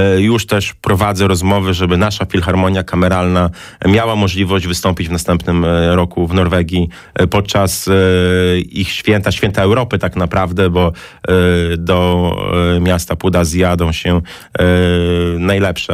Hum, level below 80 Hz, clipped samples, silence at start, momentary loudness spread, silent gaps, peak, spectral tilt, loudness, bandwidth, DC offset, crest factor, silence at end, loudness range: none; -30 dBFS; under 0.1%; 0 s; 5 LU; none; -2 dBFS; -6 dB/octave; -14 LUFS; 16 kHz; under 0.1%; 10 dB; 0 s; 1 LU